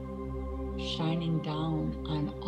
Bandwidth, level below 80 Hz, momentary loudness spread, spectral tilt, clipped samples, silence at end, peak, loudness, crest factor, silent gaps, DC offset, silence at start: 8.8 kHz; -42 dBFS; 7 LU; -7.5 dB/octave; under 0.1%; 0 s; -20 dBFS; -33 LUFS; 12 dB; none; under 0.1%; 0 s